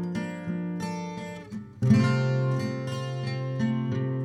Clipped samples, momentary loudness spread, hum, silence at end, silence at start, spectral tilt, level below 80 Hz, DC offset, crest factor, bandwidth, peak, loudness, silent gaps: under 0.1%; 14 LU; none; 0 s; 0 s; -7.5 dB/octave; -60 dBFS; under 0.1%; 18 dB; 10 kHz; -8 dBFS; -28 LUFS; none